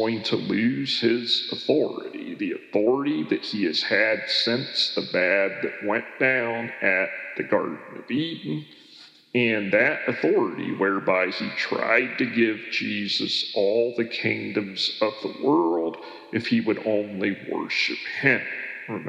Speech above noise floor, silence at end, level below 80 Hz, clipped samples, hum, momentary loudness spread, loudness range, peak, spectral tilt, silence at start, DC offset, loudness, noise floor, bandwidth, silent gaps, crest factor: 26 dB; 0 s; -84 dBFS; under 0.1%; none; 8 LU; 3 LU; -4 dBFS; -5 dB/octave; 0 s; under 0.1%; -24 LUFS; -50 dBFS; 10.5 kHz; none; 20 dB